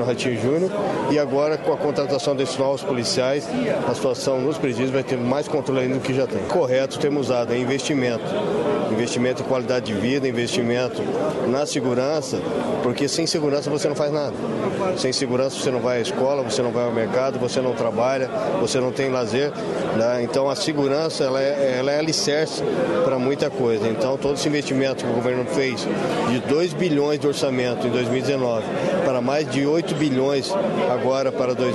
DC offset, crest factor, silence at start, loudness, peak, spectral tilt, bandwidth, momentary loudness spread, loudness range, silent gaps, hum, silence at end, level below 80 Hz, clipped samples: under 0.1%; 14 dB; 0 s; -22 LUFS; -6 dBFS; -5 dB/octave; 12 kHz; 3 LU; 1 LU; none; none; 0 s; -58 dBFS; under 0.1%